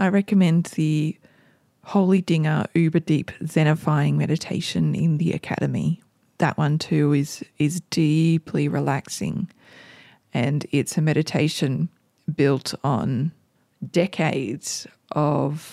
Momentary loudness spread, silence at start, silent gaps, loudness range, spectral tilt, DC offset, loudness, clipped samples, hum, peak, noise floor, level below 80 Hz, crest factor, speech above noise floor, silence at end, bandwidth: 9 LU; 0 s; none; 3 LU; -6.5 dB/octave; under 0.1%; -23 LUFS; under 0.1%; none; -6 dBFS; -59 dBFS; -60 dBFS; 16 dB; 37 dB; 0 s; 14 kHz